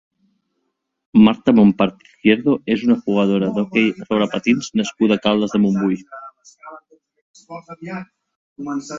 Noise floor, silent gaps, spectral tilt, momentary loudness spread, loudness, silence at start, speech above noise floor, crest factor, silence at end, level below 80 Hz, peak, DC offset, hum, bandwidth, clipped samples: -73 dBFS; 7.22-7.34 s, 8.36-8.56 s; -6.5 dB/octave; 19 LU; -17 LUFS; 1.15 s; 56 dB; 18 dB; 0 s; -56 dBFS; -2 dBFS; under 0.1%; none; 7.6 kHz; under 0.1%